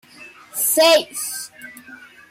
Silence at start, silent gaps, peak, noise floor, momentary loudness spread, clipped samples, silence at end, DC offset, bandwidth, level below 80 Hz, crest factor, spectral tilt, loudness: 0.2 s; none; -6 dBFS; -44 dBFS; 23 LU; under 0.1%; 0.25 s; under 0.1%; 16.5 kHz; -70 dBFS; 16 dB; 0.5 dB/octave; -17 LUFS